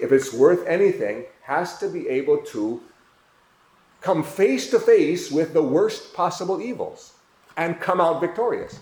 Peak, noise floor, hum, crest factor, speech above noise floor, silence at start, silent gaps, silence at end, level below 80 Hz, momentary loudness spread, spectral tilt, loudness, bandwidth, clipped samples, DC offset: -4 dBFS; -58 dBFS; none; 18 dB; 37 dB; 0 s; none; 0 s; -66 dBFS; 11 LU; -5.5 dB/octave; -22 LUFS; 20 kHz; under 0.1%; under 0.1%